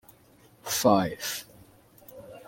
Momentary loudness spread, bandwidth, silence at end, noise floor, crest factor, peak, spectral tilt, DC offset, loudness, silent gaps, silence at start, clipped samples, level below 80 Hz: 25 LU; 17 kHz; 0.05 s; -58 dBFS; 22 dB; -8 dBFS; -4 dB/octave; under 0.1%; -26 LUFS; none; 0.65 s; under 0.1%; -62 dBFS